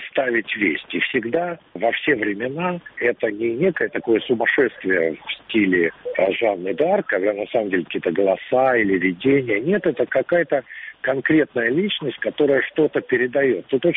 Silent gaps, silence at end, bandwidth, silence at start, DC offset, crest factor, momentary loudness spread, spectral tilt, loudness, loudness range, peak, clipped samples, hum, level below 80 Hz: none; 0 s; 4 kHz; 0 s; under 0.1%; 14 dB; 6 LU; -3.5 dB/octave; -20 LUFS; 2 LU; -6 dBFS; under 0.1%; none; -62 dBFS